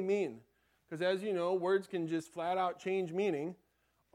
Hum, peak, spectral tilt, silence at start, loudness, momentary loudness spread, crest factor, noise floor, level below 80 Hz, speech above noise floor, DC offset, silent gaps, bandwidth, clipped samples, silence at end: none; -20 dBFS; -6 dB/octave; 0 s; -35 LUFS; 7 LU; 16 dB; -77 dBFS; -82 dBFS; 42 dB; under 0.1%; none; 12 kHz; under 0.1%; 0.6 s